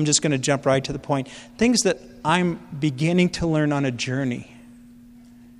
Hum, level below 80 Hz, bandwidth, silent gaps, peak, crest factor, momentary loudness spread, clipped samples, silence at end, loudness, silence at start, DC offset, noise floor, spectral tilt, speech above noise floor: none; -50 dBFS; 13 kHz; none; -4 dBFS; 20 dB; 7 LU; under 0.1%; 0.85 s; -22 LUFS; 0 s; under 0.1%; -47 dBFS; -4.5 dB/octave; 25 dB